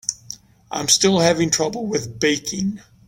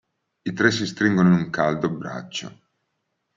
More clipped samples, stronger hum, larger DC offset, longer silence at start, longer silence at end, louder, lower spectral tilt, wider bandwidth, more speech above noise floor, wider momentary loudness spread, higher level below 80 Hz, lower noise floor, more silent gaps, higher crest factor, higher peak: neither; neither; neither; second, 0.1 s vs 0.45 s; second, 0.3 s vs 0.85 s; first, -19 LUFS vs -22 LUFS; second, -3 dB/octave vs -6 dB/octave; first, 17 kHz vs 7.6 kHz; second, 21 dB vs 54 dB; first, 17 LU vs 14 LU; first, -52 dBFS vs -62 dBFS; second, -41 dBFS vs -76 dBFS; neither; about the same, 20 dB vs 20 dB; about the same, -2 dBFS vs -4 dBFS